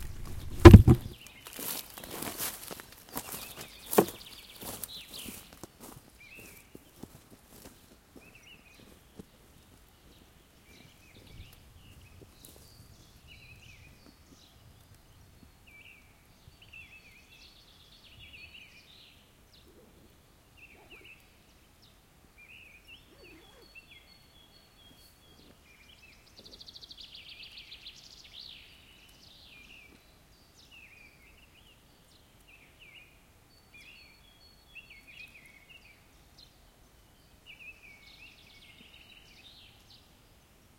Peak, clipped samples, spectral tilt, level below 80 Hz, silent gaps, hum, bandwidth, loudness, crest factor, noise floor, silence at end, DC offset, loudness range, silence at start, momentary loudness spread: 0 dBFS; under 0.1%; -6.5 dB/octave; -42 dBFS; none; none; 16.5 kHz; -24 LUFS; 32 dB; -61 dBFS; 36.75 s; under 0.1%; 20 LU; 0.3 s; 20 LU